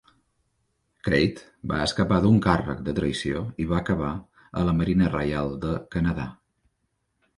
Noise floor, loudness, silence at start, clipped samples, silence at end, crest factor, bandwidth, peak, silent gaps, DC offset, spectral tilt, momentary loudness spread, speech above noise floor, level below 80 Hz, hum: -75 dBFS; -25 LUFS; 1.05 s; under 0.1%; 1.05 s; 22 dB; 11.5 kHz; -4 dBFS; none; under 0.1%; -7 dB/octave; 12 LU; 51 dB; -42 dBFS; none